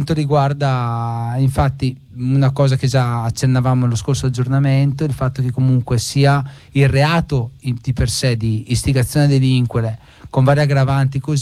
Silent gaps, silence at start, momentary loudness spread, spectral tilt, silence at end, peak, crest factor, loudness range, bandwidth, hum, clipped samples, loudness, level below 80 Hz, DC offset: none; 0 s; 7 LU; -6.5 dB/octave; 0 s; -4 dBFS; 12 dB; 1 LU; 13.5 kHz; none; under 0.1%; -17 LUFS; -36 dBFS; under 0.1%